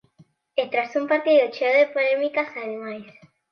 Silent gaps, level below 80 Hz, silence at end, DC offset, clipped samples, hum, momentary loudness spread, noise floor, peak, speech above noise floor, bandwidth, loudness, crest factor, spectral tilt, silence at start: none; -78 dBFS; 0.4 s; under 0.1%; under 0.1%; none; 13 LU; -57 dBFS; -8 dBFS; 35 dB; 6.6 kHz; -22 LUFS; 16 dB; -5 dB/octave; 0.55 s